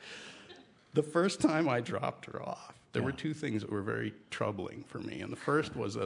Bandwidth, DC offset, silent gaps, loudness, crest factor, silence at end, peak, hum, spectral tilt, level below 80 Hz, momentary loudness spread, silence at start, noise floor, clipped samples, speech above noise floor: 11 kHz; under 0.1%; none; -34 LUFS; 22 dB; 0 s; -14 dBFS; none; -6 dB/octave; -70 dBFS; 15 LU; 0 s; -57 dBFS; under 0.1%; 23 dB